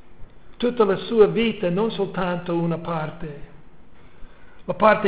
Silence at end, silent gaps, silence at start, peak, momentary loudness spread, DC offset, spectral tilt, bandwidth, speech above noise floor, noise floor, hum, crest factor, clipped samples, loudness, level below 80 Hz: 0 s; none; 0.1 s; -2 dBFS; 17 LU; 1%; -10.5 dB/octave; 4 kHz; 28 dB; -49 dBFS; none; 20 dB; under 0.1%; -22 LUFS; -50 dBFS